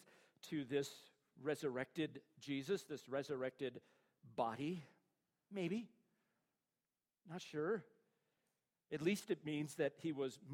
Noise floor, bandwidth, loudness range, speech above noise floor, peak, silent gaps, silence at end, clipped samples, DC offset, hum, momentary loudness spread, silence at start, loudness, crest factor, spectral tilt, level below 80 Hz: under -90 dBFS; 16 kHz; 4 LU; over 46 dB; -26 dBFS; none; 0 s; under 0.1%; under 0.1%; none; 10 LU; 0 s; -45 LUFS; 20 dB; -5.5 dB/octave; -88 dBFS